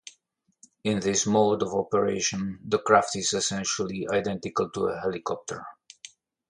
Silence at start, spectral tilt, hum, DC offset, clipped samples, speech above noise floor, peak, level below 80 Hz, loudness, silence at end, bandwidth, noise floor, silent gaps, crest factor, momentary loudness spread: 0.05 s; -3.5 dB/octave; none; under 0.1%; under 0.1%; 45 dB; -4 dBFS; -60 dBFS; -26 LUFS; 0.45 s; 11 kHz; -71 dBFS; none; 22 dB; 17 LU